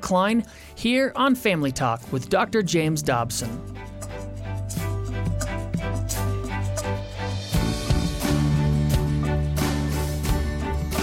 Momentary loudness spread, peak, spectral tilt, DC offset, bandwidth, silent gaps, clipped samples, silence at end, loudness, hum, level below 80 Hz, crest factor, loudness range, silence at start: 10 LU; -10 dBFS; -5.5 dB/octave; under 0.1%; 16.5 kHz; none; under 0.1%; 0 s; -25 LUFS; none; -32 dBFS; 14 dB; 5 LU; 0 s